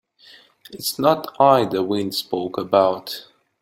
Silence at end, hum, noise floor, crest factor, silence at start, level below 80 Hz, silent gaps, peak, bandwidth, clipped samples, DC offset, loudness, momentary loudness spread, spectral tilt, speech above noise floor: 0.4 s; none; -50 dBFS; 20 dB; 0.7 s; -62 dBFS; none; -2 dBFS; 16.5 kHz; under 0.1%; under 0.1%; -20 LUFS; 12 LU; -5 dB/octave; 30 dB